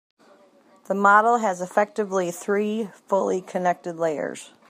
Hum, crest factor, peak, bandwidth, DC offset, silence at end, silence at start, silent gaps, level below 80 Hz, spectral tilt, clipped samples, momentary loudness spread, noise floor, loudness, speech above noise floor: none; 20 dB; -4 dBFS; 15.5 kHz; under 0.1%; 0.2 s; 0.9 s; none; -80 dBFS; -5 dB/octave; under 0.1%; 11 LU; -56 dBFS; -23 LUFS; 33 dB